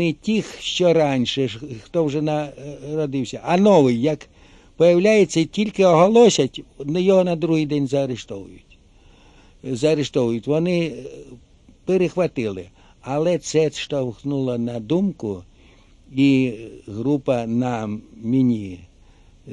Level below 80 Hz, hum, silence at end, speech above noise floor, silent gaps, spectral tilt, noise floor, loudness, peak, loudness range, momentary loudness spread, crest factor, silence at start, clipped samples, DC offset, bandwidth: -52 dBFS; none; 0 s; 31 dB; none; -6 dB/octave; -51 dBFS; -20 LUFS; -2 dBFS; 7 LU; 16 LU; 18 dB; 0 s; under 0.1%; under 0.1%; 11 kHz